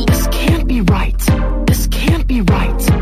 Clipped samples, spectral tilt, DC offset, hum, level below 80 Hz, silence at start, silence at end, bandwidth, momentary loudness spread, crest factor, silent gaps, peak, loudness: under 0.1%; -5.5 dB/octave; under 0.1%; none; -16 dBFS; 0 s; 0 s; 16 kHz; 1 LU; 12 dB; none; -2 dBFS; -15 LUFS